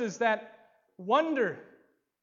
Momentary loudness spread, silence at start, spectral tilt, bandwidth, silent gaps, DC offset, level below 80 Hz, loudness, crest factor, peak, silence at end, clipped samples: 15 LU; 0 s; -4.5 dB/octave; 7.6 kHz; none; under 0.1%; -88 dBFS; -29 LUFS; 18 dB; -12 dBFS; 0.6 s; under 0.1%